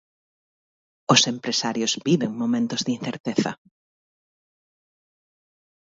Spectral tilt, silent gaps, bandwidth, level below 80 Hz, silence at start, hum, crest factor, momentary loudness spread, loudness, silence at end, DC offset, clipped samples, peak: -3.5 dB/octave; 3.20-3.24 s; 7.8 kHz; -70 dBFS; 1.1 s; none; 26 dB; 11 LU; -22 LUFS; 2.4 s; under 0.1%; under 0.1%; 0 dBFS